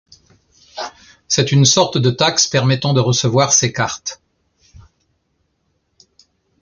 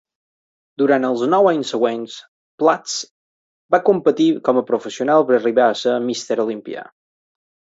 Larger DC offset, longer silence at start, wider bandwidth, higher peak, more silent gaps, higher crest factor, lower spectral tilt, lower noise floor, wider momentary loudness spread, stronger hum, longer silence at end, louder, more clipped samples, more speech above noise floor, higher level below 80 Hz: neither; about the same, 0.75 s vs 0.8 s; first, 10 kHz vs 8 kHz; about the same, 0 dBFS vs -2 dBFS; second, none vs 2.28-2.58 s, 3.11-3.69 s; about the same, 18 dB vs 18 dB; about the same, -3.5 dB/octave vs -4.5 dB/octave; second, -67 dBFS vs under -90 dBFS; first, 18 LU vs 14 LU; neither; first, 2.45 s vs 0.9 s; first, -14 LUFS vs -18 LUFS; neither; second, 52 dB vs over 73 dB; first, -52 dBFS vs -70 dBFS